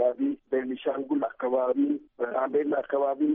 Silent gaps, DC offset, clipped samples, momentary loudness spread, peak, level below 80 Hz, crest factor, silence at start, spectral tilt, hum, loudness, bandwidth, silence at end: none; under 0.1%; under 0.1%; 5 LU; -14 dBFS; -72 dBFS; 14 dB; 0 s; -4.5 dB/octave; none; -28 LUFS; 3.7 kHz; 0 s